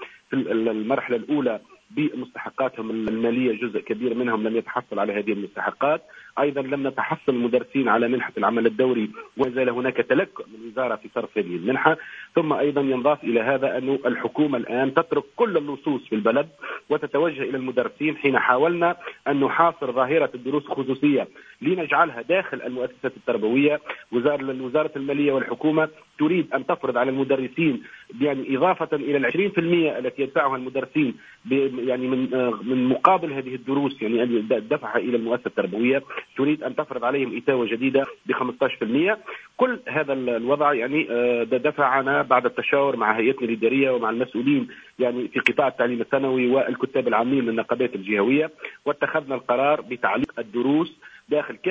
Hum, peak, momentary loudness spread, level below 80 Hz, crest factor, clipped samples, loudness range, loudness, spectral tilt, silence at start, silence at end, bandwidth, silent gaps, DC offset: none; 0 dBFS; 7 LU; -68 dBFS; 22 dB; under 0.1%; 3 LU; -23 LUFS; -7.5 dB/octave; 0 s; 0 s; 7.6 kHz; none; under 0.1%